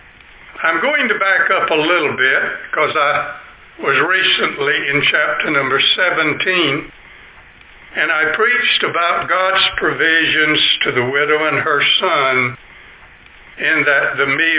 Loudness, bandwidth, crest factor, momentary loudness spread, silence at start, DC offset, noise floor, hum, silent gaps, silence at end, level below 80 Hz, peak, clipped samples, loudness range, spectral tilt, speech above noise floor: -14 LUFS; 4 kHz; 14 dB; 6 LU; 0.45 s; under 0.1%; -42 dBFS; none; none; 0 s; -52 dBFS; -2 dBFS; under 0.1%; 3 LU; -6.5 dB/octave; 27 dB